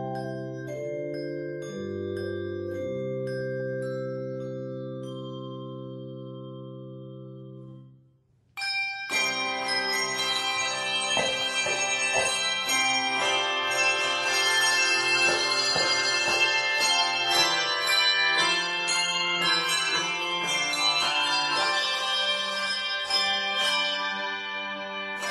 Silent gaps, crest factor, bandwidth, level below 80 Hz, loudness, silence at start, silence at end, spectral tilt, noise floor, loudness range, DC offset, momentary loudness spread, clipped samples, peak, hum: none; 18 dB; 16 kHz; -68 dBFS; -24 LUFS; 0 s; 0 s; -1.5 dB/octave; -64 dBFS; 14 LU; under 0.1%; 16 LU; under 0.1%; -10 dBFS; none